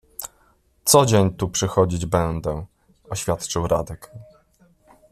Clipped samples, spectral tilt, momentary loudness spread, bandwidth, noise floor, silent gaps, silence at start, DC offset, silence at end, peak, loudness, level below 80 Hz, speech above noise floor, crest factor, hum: under 0.1%; -4.5 dB/octave; 19 LU; 15 kHz; -60 dBFS; none; 0.2 s; under 0.1%; 0.9 s; -2 dBFS; -21 LUFS; -44 dBFS; 39 dB; 20 dB; none